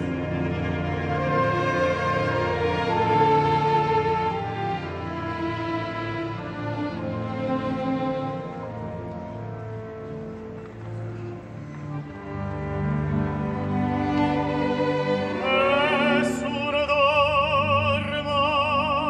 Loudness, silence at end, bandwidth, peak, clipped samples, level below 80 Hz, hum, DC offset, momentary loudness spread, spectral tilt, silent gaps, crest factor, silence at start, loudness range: -24 LUFS; 0 s; 11 kHz; -8 dBFS; under 0.1%; -46 dBFS; none; under 0.1%; 14 LU; -6.5 dB/octave; none; 16 dB; 0 s; 13 LU